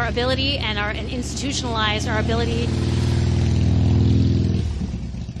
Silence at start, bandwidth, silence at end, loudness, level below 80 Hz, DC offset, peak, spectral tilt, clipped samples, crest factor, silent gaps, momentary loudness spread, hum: 0 s; 11 kHz; 0 s; -21 LUFS; -30 dBFS; under 0.1%; -6 dBFS; -5.5 dB/octave; under 0.1%; 14 dB; none; 9 LU; none